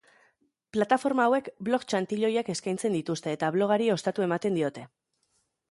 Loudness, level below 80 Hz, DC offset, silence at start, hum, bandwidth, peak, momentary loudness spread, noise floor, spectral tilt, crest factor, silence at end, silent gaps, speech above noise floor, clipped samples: -28 LUFS; -74 dBFS; under 0.1%; 0.75 s; none; 11.5 kHz; -10 dBFS; 6 LU; -74 dBFS; -5.5 dB/octave; 18 dB; 0.85 s; none; 47 dB; under 0.1%